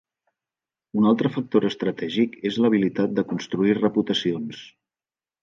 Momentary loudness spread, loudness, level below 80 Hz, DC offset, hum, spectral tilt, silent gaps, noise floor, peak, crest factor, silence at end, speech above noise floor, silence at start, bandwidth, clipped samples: 7 LU; -23 LUFS; -66 dBFS; under 0.1%; none; -6.5 dB/octave; none; under -90 dBFS; -6 dBFS; 18 dB; 0.75 s; over 68 dB; 0.95 s; 7.4 kHz; under 0.1%